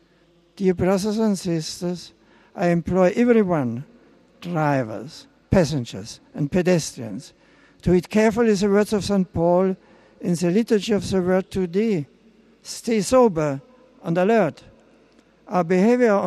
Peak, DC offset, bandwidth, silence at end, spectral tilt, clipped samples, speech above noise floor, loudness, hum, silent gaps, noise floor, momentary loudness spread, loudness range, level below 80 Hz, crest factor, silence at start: -4 dBFS; under 0.1%; 13 kHz; 0 s; -6.5 dB/octave; under 0.1%; 38 dB; -21 LUFS; none; none; -58 dBFS; 17 LU; 3 LU; -48 dBFS; 18 dB; 0.6 s